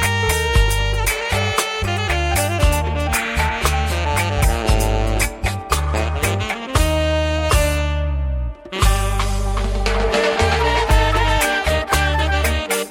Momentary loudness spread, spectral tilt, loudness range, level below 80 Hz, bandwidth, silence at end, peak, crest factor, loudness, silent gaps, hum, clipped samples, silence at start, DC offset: 5 LU; -4 dB/octave; 2 LU; -22 dBFS; 16.5 kHz; 0 s; -4 dBFS; 14 dB; -19 LUFS; none; none; under 0.1%; 0 s; under 0.1%